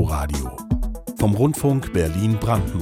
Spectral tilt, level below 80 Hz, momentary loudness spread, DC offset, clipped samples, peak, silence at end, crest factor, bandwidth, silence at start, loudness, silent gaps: -7 dB/octave; -30 dBFS; 8 LU; under 0.1%; under 0.1%; -8 dBFS; 0 s; 14 dB; 17 kHz; 0 s; -22 LUFS; none